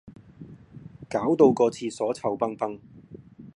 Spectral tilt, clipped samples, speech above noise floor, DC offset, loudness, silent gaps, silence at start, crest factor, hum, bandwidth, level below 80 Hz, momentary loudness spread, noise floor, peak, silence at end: -6.5 dB/octave; under 0.1%; 23 dB; under 0.1%; -25 LUFS; none; 0.05 s; 22 dB; none; 11.5 kHz; -62 dBFS; 26 LU; -47 dBFS; -6 dBFS; 0.1 s